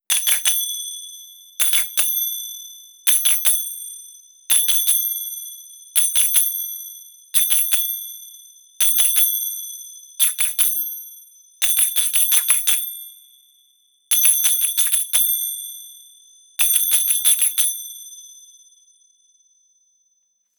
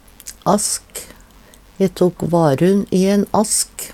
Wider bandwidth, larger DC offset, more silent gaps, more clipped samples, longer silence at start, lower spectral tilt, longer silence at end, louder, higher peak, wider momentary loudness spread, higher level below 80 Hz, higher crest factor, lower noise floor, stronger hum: first, over 20 kHz vs 16.5 kHz; neither; neither; neither; second, 0.1 s vs 0.25 s; second, 5.5 dB/octave vs -5 dB/octave; first, 2.25 s vs 0 s; about the same, -16 LUFS vs -17 LUFS; about the same, 0 dBFS vs -2 dBFS; first, 20 LU vs 9 LU; second, -76 dBFS vs -48 dBFS; about the same, 20 dB vs 16 dB; first, -67 dBFS vs -45 dBFS; neither